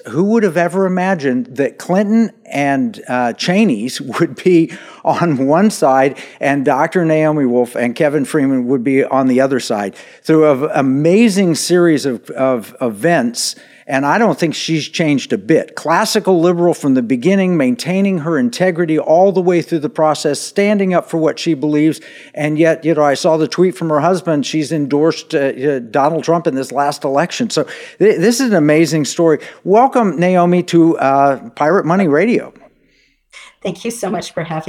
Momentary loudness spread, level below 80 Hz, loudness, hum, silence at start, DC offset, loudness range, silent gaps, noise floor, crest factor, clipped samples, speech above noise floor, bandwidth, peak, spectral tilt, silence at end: 7 LU; -68 dBFS; -14 LUFS; none; 0.05 s; under 0.1%; 3 LU; none; -56 dBFS; 12 dB; under 0.1%; 42 dB; 15.5 kHz; -2 dBFS; -5.5 dB/octave; 0 s